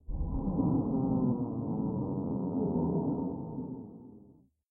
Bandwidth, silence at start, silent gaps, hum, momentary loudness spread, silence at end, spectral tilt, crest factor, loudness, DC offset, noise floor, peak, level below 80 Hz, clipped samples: 1.5 kHz; 0.1 s; none; none; 11 LU; 0.45 s; -16 dB/octave; 14 dB; -33 LUFS; under 0.1%; -60 dBFS; -18 dBFS; -46 dBFS; under 0.1%